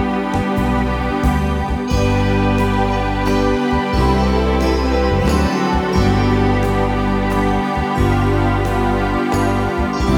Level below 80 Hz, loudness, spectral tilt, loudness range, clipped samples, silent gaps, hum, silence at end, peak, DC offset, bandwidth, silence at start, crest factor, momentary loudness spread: -22 dBFS; -17 LUFS; -7 dB/octave; 1 LU; under 0.1%; none; none; 0 s; -2 dBFS; under 0.1%; 18 kHz; 0 s; 14 dB; 3 LU